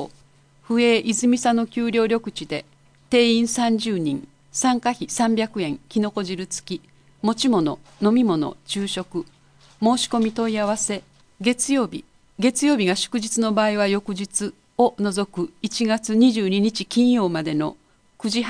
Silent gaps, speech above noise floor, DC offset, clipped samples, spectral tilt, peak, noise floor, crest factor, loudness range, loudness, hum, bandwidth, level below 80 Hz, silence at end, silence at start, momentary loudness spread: none; 33 dB; under 0.1%; under 0.1%; -4 dB/octave; -6 dBFS; -54 dBFS; 16 dB; 3 LU; -22 LUFS; none; 10.5 kHz; -58 dBFS; 0 s; 0 s; 11 LU